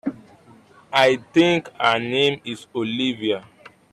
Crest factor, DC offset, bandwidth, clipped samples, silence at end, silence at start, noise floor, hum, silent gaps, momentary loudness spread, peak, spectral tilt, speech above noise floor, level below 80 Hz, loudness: 16 dB; under 0.1%; 12.5 kHz; under 0.1%; 0.5 s; 0.05 s; -50 dBFS; none; none; 12 LU; -6 dBFS; -5 dB/octave; 30 dB; -64 dBFS; -20 LUFS